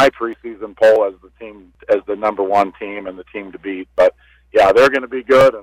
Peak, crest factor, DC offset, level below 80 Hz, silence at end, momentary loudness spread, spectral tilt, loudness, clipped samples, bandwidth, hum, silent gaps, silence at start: -4 dBFS; 12 dB; under 0.1%; -50 dBFS; 0 s; 19 LU; -5 dB/octave; -15 LUFS; under 0.1%; 12 kHz; none; none; 0 s